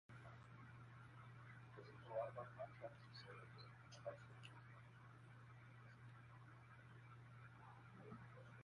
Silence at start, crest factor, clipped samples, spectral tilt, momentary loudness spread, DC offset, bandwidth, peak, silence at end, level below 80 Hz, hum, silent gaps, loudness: 0.1 s; 22 dB; under 0.1%; -6.5 dB/octave; 11 LU; under 0.1%; 11 kHz; -36 dBFS; 0 s; -80 dBFS; none; none; -59 LUFS